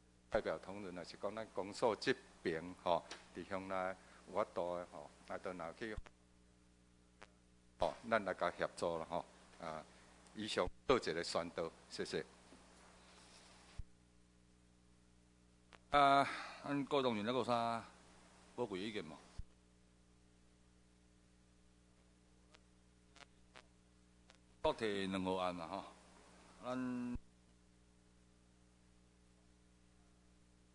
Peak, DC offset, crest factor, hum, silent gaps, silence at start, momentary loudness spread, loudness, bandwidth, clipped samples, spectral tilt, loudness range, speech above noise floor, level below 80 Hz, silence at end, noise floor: -18 dBFS; under 0.1%; 26 dB; 60 Hz at -70 dBFS; none; 0.3 s; 20 LU; -41 LUFS; 11 kHz; under 0.1%; -5 dB/octave; 13 LU; 29 dB; -66 dBFS; 3.45 s; -69 dBFS